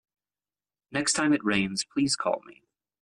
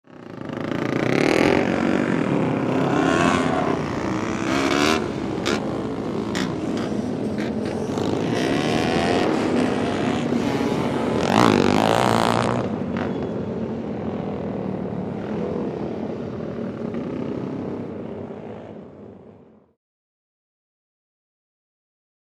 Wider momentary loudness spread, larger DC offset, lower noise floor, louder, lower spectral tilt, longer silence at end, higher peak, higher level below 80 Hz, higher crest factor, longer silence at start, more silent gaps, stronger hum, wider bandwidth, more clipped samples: second, 8 LU vs 12 LU; neither; first, under -90 dBFS vs -48 dBFS; second, -27 LUFS vs -23 LUFS; second, -3 dB/octave vs -5.5 dB/octave; second, 0.5 s vs 2.9 s; second, -12 dBFS vs -2 dBFS; second, -66 dBFS vs -50 dBFS; second, 16 dB vs 22 dB; first, 0.9 s vs 0.1 s; neither; first, 50 Hz at -50 dBFS vs none; second, 11.5 kHz vs 15 kHz; neither